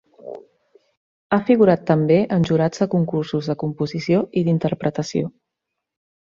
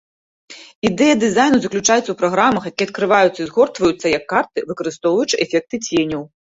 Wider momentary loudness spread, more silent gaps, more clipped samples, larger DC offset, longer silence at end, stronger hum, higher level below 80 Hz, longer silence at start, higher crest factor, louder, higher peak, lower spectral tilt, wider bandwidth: first, 13 LU vs 8 LU; first, 0.97-1.30 s vs 0.75-0.82 s; neither; neither; first, 0.9 s vs 0.25 s; neither; about the same, -56 dBFS vs -54 dBFS; second, 0.25 s vs 0.5 s; about the same, 18 dB vs 16 dB; second, -20 LUFS vs -17 LUFS; about the same, -2 dBFS vs -2 dBFS; first, -7.5 dB/octave vs -3.5 dB/octave; about the same, 7.4 kHz vs 8 kHz